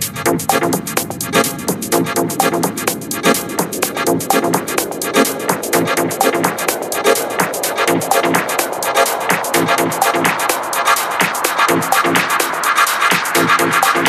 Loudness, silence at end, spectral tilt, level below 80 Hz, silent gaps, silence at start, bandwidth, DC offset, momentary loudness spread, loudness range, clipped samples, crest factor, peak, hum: -15 LUFS; 0 s; -3 dB/octave; -56 dBFS; none; 0 s; 16 kHz; under 0.1%; 5 LU; 3 LU; under 0.1%; 16 dB; 0 dBFS; none